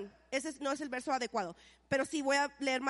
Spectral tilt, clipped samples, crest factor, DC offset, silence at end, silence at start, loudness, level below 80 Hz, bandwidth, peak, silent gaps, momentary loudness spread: -3 dB/octave; under 0.1%; 16 dB; under 0.1%; 0 s; 0 s; -35 LUFS; -70 dBFS; 11.5 kHz; -18 dBFS; none; 7 LU